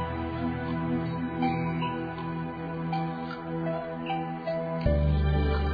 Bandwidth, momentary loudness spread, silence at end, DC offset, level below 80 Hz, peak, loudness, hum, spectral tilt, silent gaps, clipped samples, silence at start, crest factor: 5 kHz; 8 LU; 0 s; under 0.1%; -36 dBFS; -12 dBFS; -30 LUFS; none; -10 dB/octave; none; under 0.1%; 0 s; 16 dB